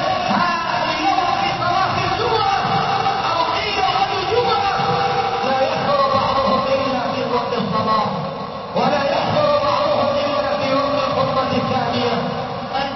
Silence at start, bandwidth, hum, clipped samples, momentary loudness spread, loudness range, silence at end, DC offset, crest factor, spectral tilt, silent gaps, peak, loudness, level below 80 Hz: 0 s; 6.2 kHz; none; under 0.1%; 4 LU; 1 LU; 0 s; under 0.1%; 14 dB; -5.5 dB/octave; none; -4 dBFS; -18 LUFS; -46 dBFS